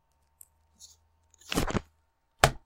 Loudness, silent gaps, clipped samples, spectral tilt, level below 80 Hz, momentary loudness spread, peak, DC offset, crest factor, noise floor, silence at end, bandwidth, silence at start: -30 LUFS; none; under 0.1%; -3.5 dB/octave; -44 dBFS; 27 LU; 0 dBFS; under 0.1%; 32 dB; -72 dBFS; 0.1 s; 16 kHz; 0.8 s